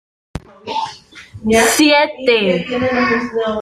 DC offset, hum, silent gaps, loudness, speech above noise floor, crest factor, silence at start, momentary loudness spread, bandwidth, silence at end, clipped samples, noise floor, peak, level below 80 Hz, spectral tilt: under 0.1%; none; none; -15 LUFS; 23 dB; 14 dB; 0.35 s; 20 LU; 15 kHz; 0 s; under 0.1%; -37 dBFS; -2 dBFS; -44 dBFS; -3.5 dB/octave